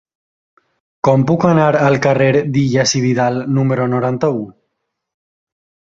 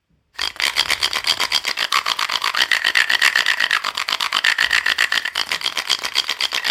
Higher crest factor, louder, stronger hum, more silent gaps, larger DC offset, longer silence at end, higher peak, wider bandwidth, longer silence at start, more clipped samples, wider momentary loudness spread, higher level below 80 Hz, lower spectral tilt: second, 14 dB vs 20 dB; first, -14 LUFS vs -17 LUFS; neither; neither; neither; first, 1.45 s vs 0 s; about the same, -2 dBFS vs 0 dBFS; second, 7.8 kHz vs 18.5 kHz; first, 1.05 s vs 0.4 s; neither; about the same, 6 LU vs 6 LU; about the same, -52 dBFS vs -56 dBFS; first, -6 dB/octave vs 2 dB/octave